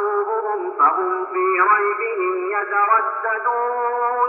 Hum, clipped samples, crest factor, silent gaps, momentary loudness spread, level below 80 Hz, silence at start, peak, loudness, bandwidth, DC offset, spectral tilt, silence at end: none; under 0.1%; 14 dB; none; 6 LU; -88 dBFS; 0 s; -4 dBFS; -19 LUFS; 3 kHz; under 0.1%; -1.5 dB/octave; 0 s